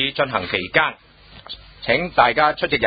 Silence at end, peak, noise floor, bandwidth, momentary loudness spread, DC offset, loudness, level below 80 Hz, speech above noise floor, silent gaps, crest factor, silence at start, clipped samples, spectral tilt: 0 s; 0 dBFS; -39 dBFS; 5 kHz; 19 LU; under 0.1%; -19 LUFS; -46 dBFS; 20 dB; none; 20 dB; 0 s; under 0.1%; -9 dB/octave